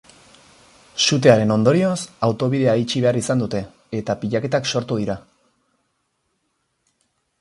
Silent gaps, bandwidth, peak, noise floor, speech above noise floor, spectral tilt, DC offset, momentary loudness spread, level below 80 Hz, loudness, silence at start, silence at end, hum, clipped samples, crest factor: none; 11.5 kHz; 0 dBFS; -71 dBFS; 52 dB; -5 dB/octave; under 0.1%; 13 LU; -54 dBFS; -19 LUFS; 0.95 s; 2.2 s; none; under 0.1%; 20 dB